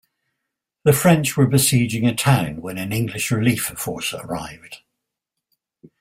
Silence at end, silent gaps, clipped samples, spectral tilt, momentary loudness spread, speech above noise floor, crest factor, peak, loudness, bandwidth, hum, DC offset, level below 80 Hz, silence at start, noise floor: 1.25 s; none; under 0.1%; -5 dB/octave; 13 LU; 63 dB; 18 dB; -2 dBFS; -19 LUFS; 16.5 kHz; none; under 0.1%; -52 dBFS; 0.85 s; -82 dBFS